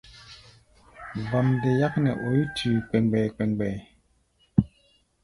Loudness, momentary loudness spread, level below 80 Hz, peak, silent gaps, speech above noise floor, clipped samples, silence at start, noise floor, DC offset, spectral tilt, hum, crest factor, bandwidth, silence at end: -25 LUFS; 17 LU; -52 dBFS; -4 dBFS; none; 42 dB; under 0.1%; 0.1 s; -66 dBFS; under 0.1%; -8 dB/octave; none; 22 dB; 11.5 kHz; 0.6 s